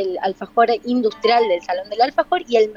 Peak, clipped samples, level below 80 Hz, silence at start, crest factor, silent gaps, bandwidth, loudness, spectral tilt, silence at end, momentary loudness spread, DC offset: -4 dBFS; under 0.1%; -58 dBFS; 0 s; 14 dB; none; 7.2 kHz; -19 LUFS; -4.5 dB/octave; 0 s; 6 LU; under 0.1%